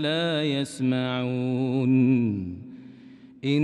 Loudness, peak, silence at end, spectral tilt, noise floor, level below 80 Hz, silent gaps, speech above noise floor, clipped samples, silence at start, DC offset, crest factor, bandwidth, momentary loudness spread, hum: -25 LUFS; -12 dBFS; 0 s; -6.5 dB/octave; -48 dBFS; -66 dBFS; none; 24 dB; under 0.1%; 0 s; under 0.1%; 14 dB; 11.5 kHz; 16 LU; none